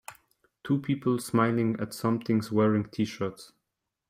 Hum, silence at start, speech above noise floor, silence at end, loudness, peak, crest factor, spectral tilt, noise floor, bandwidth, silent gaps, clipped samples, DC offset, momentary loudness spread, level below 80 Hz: none; 0.1 s; 57 dB; 0.65 s; -28 LUFS; -12 dBFS; 18 dB; -7 dB/octave; -84 dBFS; 16 kHz; none; under 0.1%; under 0.1%; 10 LU; -66 dBFS